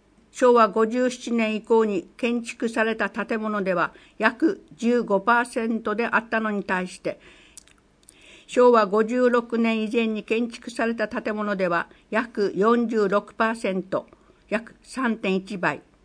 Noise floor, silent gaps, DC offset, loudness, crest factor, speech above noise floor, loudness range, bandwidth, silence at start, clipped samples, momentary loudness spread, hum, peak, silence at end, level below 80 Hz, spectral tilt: -55 dBFS; none; under 0.1%; -23 LUFS; 22 dB; 32 dB; 3 LU; 10.5 kHz; 0.35 s; under 0.1%; 9 LU; none; -2 dBFS; 0.25 s; -62 dBFS; -5.5 dB/octave